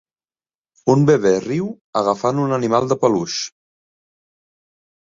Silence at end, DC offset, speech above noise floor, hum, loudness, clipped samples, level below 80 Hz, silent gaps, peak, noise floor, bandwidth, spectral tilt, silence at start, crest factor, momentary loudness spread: 1.55 s; under 0.1%; over 73 dB; none; -18 LUFS; under 0.1%; -60 dBFS; 1.81-1.93 s; -2 dBFS; under -90 dBFS; 7.6 kHz; -6 dB/octave; 0.85 s; 18 dB; 10 LU